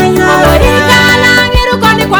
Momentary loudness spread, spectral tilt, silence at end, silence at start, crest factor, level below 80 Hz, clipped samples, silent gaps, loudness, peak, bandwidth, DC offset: 4 LU; -4.5 dB/octave; 0 s; 0 s; 6 dB; -18 dBFS; 3%; none; -6 LUFS; 0 dBFS; over 20 kHz; under 0.1%